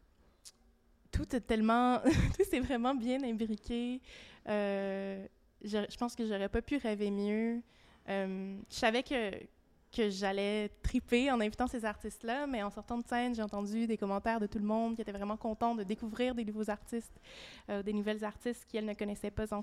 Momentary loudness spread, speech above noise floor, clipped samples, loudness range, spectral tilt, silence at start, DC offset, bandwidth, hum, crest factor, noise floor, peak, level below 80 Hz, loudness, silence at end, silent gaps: 11 LU; 32 dB; under 0.1%; 5 LU; -6 dB/octave; 0.45 s; under 0.1%; 14 kHz; none; 20 dB; -67 dBFS; -16 dBFS; -50 dBFS; -35 LUFS; 0 s; none